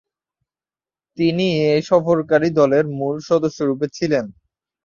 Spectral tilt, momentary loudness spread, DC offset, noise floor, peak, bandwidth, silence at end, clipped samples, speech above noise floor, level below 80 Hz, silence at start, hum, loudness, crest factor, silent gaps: -6.5 dB/octave; 7 LU; under 0.1%; under -90 dBFS; -2 dBFS; 7.4 kHz; 0.55 s; under 0.1%; over 73 dB; -58 dBFS; 1.2 s; none; -18 LUFS; 18 dB; none